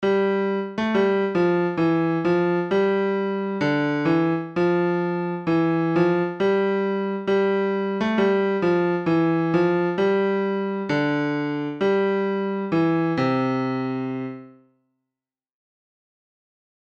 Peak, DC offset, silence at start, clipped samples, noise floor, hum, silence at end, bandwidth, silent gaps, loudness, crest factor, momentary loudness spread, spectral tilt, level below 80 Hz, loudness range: -8 dBFS; under 0.1%; 0 s; under 0.1%; -88 dBFS; none; 2.3 s; 7 kHz; none; -22 LUFS; 14 dB; 5 LU; -8 dB/octave; -62 dBFS; 4 LU